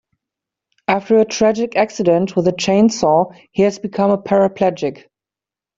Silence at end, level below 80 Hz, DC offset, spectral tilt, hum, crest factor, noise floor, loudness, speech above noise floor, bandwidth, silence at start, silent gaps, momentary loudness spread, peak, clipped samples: 0.85 s; -56 dBFS; under 0.1%; -5.5 dB/octave; none; 14 dB; -89 dBFS; -16 LUFS; 73 dB; 7.8 kHz; 0.9 s; none; 6 LU; -2 dBFS; under 0.1%